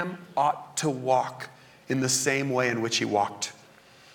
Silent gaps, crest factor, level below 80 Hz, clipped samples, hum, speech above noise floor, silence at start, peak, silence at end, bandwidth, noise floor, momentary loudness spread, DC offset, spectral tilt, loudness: none; 18 dB; -72 dBFS; under 0.1%; none; 27 dB; 0 s; -10 dBFS; 0.6 s; 19 kHz; -54 dBFS; 11 LU; under 0.1%; -3.5 dB/octave; -27 LUFS